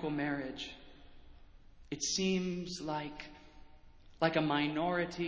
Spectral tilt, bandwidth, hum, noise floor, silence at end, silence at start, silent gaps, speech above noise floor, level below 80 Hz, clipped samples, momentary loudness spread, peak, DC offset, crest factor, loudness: -4 dB/octave; 8 kHz; none; -57 dBFS; 0 s; 0 s; none; 22 dB; -60 dBFS; under 0.1%; 15 LU; -14 dBFS; under 0.1%; 22 dB; -35 LUFS